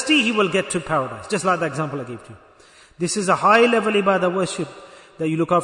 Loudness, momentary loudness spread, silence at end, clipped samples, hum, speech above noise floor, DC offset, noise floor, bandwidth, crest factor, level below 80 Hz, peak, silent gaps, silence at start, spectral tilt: -20 LUFS; 14 LU; 0 s; under 0.1%; none; 30 dB; under 0.1%; -50 dBFS; 11 kHz; 18 dB; -58 dBFS; -2 dBFS; none; 0 s; -4.5 dB/octave